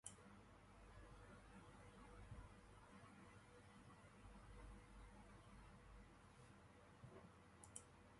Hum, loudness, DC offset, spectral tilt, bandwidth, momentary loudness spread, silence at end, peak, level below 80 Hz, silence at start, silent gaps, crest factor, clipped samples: 50 Hz at -75 dBFS; -65 LUFS; under 0.1%; -4.5 dB/octave; 11.5 kHz; 6 LU; 0 s; -36 dBFS; -68 dBFS; 0.05 s; none; 28 dB; under 0.1%